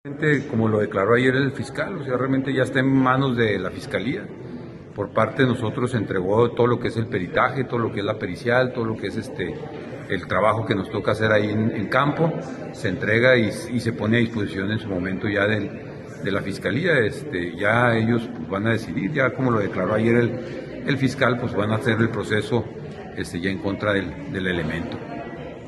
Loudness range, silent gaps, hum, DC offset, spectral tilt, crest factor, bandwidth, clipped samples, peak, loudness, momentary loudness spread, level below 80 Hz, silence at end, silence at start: 3 LU; none; none; under 0.1%; -7 dB/octave; 20 dB; 12 kHz; under 0.1%; -4 dBFS; -22 LUFS; 12 LU; -52 dBFS; 0 s; 0.05 s